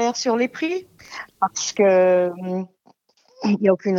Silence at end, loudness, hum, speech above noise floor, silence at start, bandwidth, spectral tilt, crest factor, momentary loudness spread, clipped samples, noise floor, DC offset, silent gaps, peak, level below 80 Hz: 0 s; -21 LUFS; none; 38 dB; 0 s; 7.8 kHz; -4.5 dB/octave; 18 dB; 19 LU; under 0.1%; -58 dBFS; under 0.1%; none; -4 dBFS; -70 dBFS